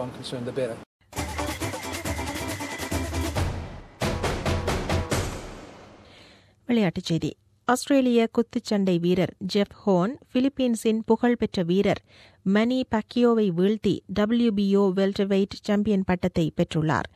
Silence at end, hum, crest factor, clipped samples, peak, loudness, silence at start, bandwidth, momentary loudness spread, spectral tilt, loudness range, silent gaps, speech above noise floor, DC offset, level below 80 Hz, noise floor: 0.1 s; none; 16 dB; under 0.1%; -8 dBFS; -25 LUFS; 0 s; 14.5 kHz; 10 LU; -6 dB/octave; 7 LU; 0.86-1.00 s; 30 dB; under 0.1%; -42 dBFS; -54 dBFS